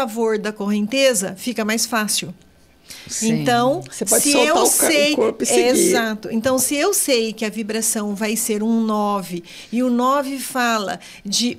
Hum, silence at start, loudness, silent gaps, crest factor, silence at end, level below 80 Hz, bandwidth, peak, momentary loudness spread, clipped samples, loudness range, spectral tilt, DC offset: none; 0 s; -18 LUFS; none; 16 dB; 0 s; -58 dBFS; 16 kHz; -2 dBFS; 10 LU; under 0.1%; 5 LU; -2.5 dB/octave; under 0.1%